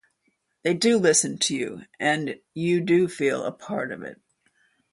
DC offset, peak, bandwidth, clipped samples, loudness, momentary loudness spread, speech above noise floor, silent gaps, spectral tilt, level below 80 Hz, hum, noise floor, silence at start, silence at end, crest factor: under 0.1%; -6 dBFS; 11.5 kHz; under 0.1%; -24 LUFS; 13 LU; 49 dB; none; -3.5 dB/octave; -68 dBFS; none; -72 dBFS; 0.65 s; 0.8 s; 20 dB